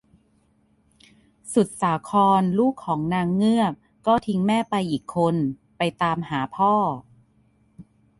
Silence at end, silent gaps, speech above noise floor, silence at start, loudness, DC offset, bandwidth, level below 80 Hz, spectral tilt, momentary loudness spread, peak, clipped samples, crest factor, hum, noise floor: 0.4 s; none; 41 dB; 1.45 s; -22 LUFS; under 0.1%; 11.5 kHz; -58 dBFS; -6.5 dB/octave; 8 LU; -6 dBFS; under 0.1%; 16 dB; none; -63 dBFS